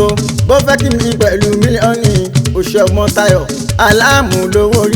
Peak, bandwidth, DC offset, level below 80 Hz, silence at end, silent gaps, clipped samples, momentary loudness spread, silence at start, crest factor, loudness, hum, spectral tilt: 0 dBFS; over 20 kHz; under 0.1%; -26 dBFS; 0 s; none; 0.2%; 5 LU; 0 s; 10 dB; -11 LUFS; none; -5 dB/octave